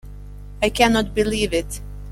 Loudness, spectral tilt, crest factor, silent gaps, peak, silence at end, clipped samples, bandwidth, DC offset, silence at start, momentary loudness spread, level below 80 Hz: -20 LUFS; -4 dB/octave; 20 dB; none; -2 dBFS; 0 s; under 0.1%; 16 kHz; under 0.1%; 0.05 s; 23 LU; -34 dBFS